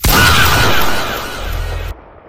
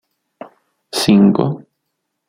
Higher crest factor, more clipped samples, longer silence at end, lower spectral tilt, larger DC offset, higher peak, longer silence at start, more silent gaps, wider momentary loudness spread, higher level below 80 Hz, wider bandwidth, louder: about the same, 12 dB vs 16 dB; neither; second, 0 s vs 0.7 s; second, -3 dB/octave vs -6 dB/octave; neither; about the same, 0 dBFS vs -2 dBFS; second, 0 s vs 0.95 s; neither; about the same, 16 LU vs 14 LU; first, -22 dBFS vs -56 dBFS; first, 18 kHz vs 15.5 kHz; about the same, -13 LUFS vs -14 LUFS